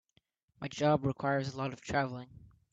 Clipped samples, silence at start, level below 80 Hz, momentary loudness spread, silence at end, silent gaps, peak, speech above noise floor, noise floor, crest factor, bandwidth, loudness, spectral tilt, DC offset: under 0.1%; 0.6 s; -64 dBFS; 16 LU; 0.35 s; none; -16 dBFS; 41 dB; -74 dBFS; 20 dB; 7.8 kHz; -33 LUFS; -6.5 dB/octave; under 0.1%